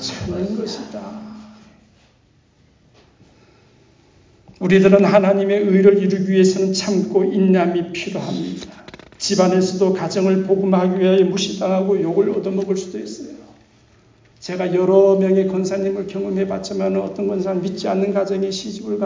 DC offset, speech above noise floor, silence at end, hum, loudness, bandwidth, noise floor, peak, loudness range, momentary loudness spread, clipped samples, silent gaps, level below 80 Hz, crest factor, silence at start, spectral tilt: under 0.1%; 39 dB; 0 s; none; -18 LUFS; 7.6 kHz; -56 dBFS; -2 dBFS; 7 LU; 16 LU; under 0.1%; none; -54 dBFS; 18 dB; 0 s; -6 dB/octave